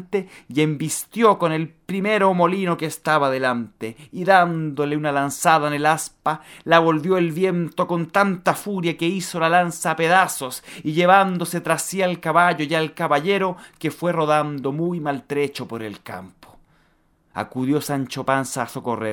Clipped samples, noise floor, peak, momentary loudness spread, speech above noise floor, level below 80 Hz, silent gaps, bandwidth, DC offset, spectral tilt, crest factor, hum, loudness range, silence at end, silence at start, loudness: under 0.1%; -61 dBFS; 0 dBFS; 11 LU; 41 dB; -64 dBFS; none; 17.5 kHz; under 0.1%; -5 dB/octave; 20 dB; none; 7 LU; 0 s; 0 s; -21 LUFS